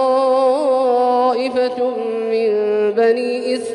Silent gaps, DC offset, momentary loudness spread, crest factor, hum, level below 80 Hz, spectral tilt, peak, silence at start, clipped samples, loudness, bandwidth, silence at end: none; under 0.1%; 5 LU; 12 dB; none; -68 dBFS; -4.5 dB/octave; -4 dBFS; 0 s; under 0.1%; -17 LUFS; 11 kHz; 0 s